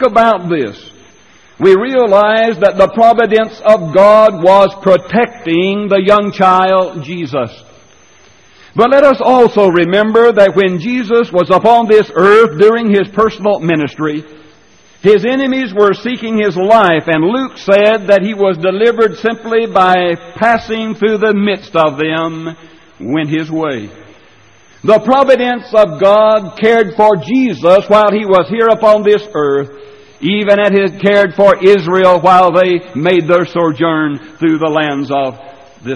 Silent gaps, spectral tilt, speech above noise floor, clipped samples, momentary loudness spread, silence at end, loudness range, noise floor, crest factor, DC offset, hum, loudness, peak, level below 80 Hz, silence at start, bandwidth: none; -6.5 dB/octave; 36 dB; 0.3%; 10 LU; 0 s; 5 LU; -45 dBFS; 10 dB; 0.3%; none; -10 LUFS; 0 dBFS; -48 dBFS; 0 s; 10 kHz